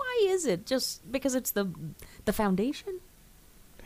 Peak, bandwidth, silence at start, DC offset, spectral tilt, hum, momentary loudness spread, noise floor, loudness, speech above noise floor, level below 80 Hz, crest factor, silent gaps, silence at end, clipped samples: -16 dBFS; 15.5 kHz; 0 s; under 0.1%; -4.5 dB/octave; none; 15 LU; -56 dBFS; -30 LUFS; 25 dB; -52 dBFS; 14 dB; none; 0 s; under 0.1%